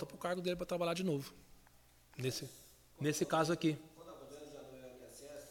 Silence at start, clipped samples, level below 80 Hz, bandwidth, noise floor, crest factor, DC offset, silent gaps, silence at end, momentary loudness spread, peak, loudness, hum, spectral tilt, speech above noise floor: 0 s; under 0.1%; -68 dBFS; 17 kHz; -65 dBFS; 20 dB; under 0.1%; none; 0 s; 20 LU; -20 dBFS; -38 LUFS; none; -5 dB/octave; 28 dB